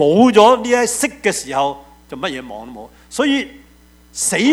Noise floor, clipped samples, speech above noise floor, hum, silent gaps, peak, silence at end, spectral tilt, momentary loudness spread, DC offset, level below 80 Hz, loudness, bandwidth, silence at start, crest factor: -47 dBFS; under 0.1%; 32 dB; none; none; 0 dBFS; 0 s; -3.5 dB/octave; 22 LU; under 0.1%; -50 dBFS; -15 LUFS; 15.5 kHz; 0 s; 16 dB